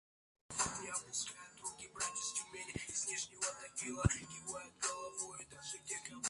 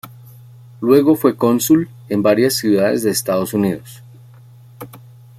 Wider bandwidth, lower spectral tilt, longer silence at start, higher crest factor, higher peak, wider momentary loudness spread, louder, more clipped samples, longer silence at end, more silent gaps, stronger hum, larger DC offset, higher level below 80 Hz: second, 11.5 kHz vs 16 kHz; second, -2.5 dB/octave vs -5 dB/octave; first, 0.5 s vs 0.05 s; first, 26 dB vs 16 dB; second, -16 dBFS vs -2 dBFS; second, 9 LU vs 18 LU; second, -41 LUFS vs -16 LUFS; neither; second, 0 s vs 0.4 s; neither; neither; neither; about the same, -56 dBFS vs -58 dBFS